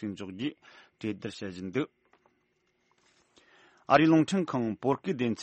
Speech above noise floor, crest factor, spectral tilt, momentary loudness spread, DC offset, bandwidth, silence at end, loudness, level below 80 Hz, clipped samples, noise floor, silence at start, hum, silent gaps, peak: 45 dB; 24 dB; -6.5 dB/octave; 16 LU; under 0.1%; 8.4 kHz; 0 s; -29 LUFS; -70 dBFS; under 0.1%; -74 dBFS; 0 s; none; none; -8 dBFS